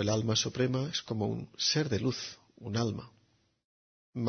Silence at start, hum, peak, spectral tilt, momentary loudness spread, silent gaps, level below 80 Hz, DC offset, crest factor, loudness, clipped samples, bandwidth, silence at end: 0 s; none; -16 dBFS; -4.5 dB/octave; 14 LU; 3.64-4.13 s; -64 dBFS; under 0.1%; 16 dB; -32 LUFS; under 0.1%; 6.6 kHz; 0 s